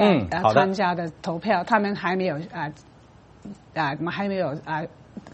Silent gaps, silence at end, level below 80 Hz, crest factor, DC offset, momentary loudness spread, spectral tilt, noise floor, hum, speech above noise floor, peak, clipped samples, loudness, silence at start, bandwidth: none; 0 s; -56 dBFS; 20 dB; under 0.1%; 16 LU; -6.5 dB/octave; -51 dBFS; none; 27 dB; -4 dBFS; under 0.1%; -24 LUFS; 0 s; 8.4 kHz